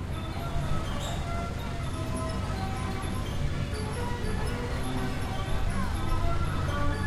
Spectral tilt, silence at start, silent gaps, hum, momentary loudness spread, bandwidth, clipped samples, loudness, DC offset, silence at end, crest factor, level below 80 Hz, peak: -6 dB/octave; 0 s; none; none; 3 LU; 14 kHz; under 0.1%; -32 LUFS; under 0.1%; 0 s; 14 dB; -34 dBFS; -14 dBFS